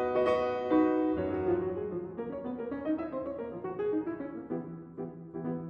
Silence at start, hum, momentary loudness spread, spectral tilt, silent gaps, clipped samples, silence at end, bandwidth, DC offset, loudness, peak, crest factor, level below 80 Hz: 0 s; none; 12 LU; -8.5 dB/octave; none; under 0.1%; 0 s; 6 kHz; under 0.1%; -33 LUFS; -16 dBFS; 16 dB; -60 dBFS